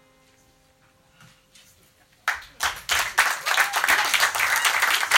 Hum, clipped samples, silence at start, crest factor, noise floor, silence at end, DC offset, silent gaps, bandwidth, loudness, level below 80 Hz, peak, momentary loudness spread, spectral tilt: none; under 0.1%; 2.25 s; 24 dB; -60 dBFS; 0 s; under 0.1%; none; 16.5 kHz; -21 LUFS; -58 dBFS; 0 dBFS; 9 LU; 1.5 dB/octave